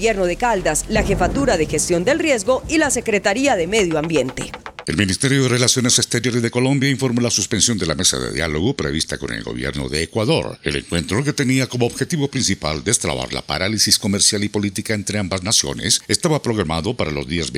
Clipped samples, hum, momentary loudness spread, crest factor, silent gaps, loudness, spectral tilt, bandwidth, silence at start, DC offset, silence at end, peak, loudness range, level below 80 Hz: under 0.1%; none; 8 LU; 18 dB; none; -18 LUFS; -3.5 dB/octave; 16.5 kHz; 0 s; under 0.1%; 0 s; 0 dBFS; 4 LU; -38 dBFS